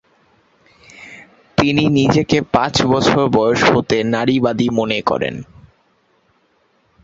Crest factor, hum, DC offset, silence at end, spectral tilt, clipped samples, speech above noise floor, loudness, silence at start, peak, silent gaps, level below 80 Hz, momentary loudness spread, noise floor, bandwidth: 16 dB; none; under 0.1%; 1.6 s; -5.5 dB/octave; under 0.1%; 45 dB; -15 LUFS; 1 s; 0 dBFS; none; -44 dBFS; 9 LU; -60 dBFS; 8 kHz